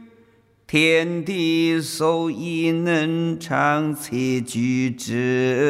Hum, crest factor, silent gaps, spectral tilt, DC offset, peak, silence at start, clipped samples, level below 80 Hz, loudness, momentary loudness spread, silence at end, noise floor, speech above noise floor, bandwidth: none; 18 dB; none; -5.5 dB/octave; under 0.1%; -4 dBFS; 0 s; under 0.1%; -62 dBFS; -21 LUFS; 6 LU; 0 s; -56 dBFS; 35 dB; 15.5 kHz